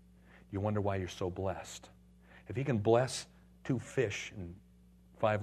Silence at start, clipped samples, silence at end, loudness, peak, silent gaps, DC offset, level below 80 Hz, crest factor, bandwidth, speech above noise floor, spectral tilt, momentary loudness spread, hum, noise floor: 0.35 s; under 0.1%; 0 s; -35 LUFS; -14 dBFS; none; under 0.1%; -62 dBFS; 22 dB; 13 kHz; 27 dB; -6 dB/octave; 19 LU; none; -61 dBFS